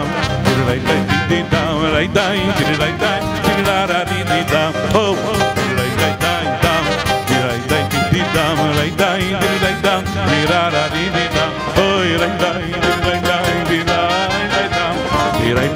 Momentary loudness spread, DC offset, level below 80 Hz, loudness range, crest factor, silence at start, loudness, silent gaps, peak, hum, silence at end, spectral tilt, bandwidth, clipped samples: 2 LU; under 0.1%; -34 dBFS; 1 LU; 14 dB; 0 s; -16 LUFS; none; -2 dBFS; none; 0 s; -5 dB/octave; 16.5 kHz; under 0.1%